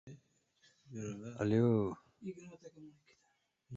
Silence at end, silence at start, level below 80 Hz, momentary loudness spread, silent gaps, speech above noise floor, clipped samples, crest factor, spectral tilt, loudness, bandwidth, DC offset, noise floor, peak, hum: 0 s; 0.05 s; -70 dBFS; 25 LU; none; 42 dB; under 0.1%; 20 dB; -8 dB/octave; -36 LUFS; 7.6 kHz; under 0.1%; -79 dBFS; -20 dBFS; none